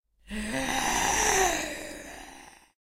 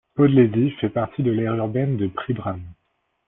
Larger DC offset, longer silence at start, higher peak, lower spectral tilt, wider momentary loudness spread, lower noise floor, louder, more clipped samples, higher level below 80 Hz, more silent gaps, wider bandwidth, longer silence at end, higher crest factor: neither; about the same, 0.25 s vs 0.15 s; about the same, -8 dBFS vs -6 dBFS; second, -1.5 dB/octave vs -12.5 dB/octave; first, 20 LU vs 11 LU; second, -50 dBFS vs -71 dBFS; second, -26 LUFS vs -21 LUFS; neither; first, -46 dBFS vs -56 dBFS; neither; first, 16 kHz vs 3.8 kHz; second, 0.3 s vs 0.55 s; first, 22 dB vs 16 dB